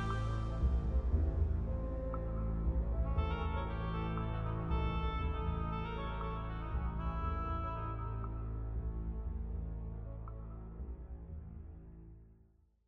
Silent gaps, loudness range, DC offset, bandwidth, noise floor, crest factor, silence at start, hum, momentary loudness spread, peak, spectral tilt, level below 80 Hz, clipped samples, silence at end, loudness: none; 8 LU; under 0.1%; 5.4 kHz; -67 dBFS; 16 dB; 0 s; none; 13 LU; -20 dBFS; -8.5 dB/octave; -40 dBFS; under 0.1%; 0.55 s; -39 LUFS